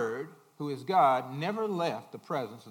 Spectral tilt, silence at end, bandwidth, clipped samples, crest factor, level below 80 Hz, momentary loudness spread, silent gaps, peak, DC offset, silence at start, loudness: -6 dB/octave; 0 s; 17 kHz; under 0.1%; 18 dB; -88 dBFS; 15 LU; none; -12 dBFS; under 0.1%; 0 s; -31 LUFS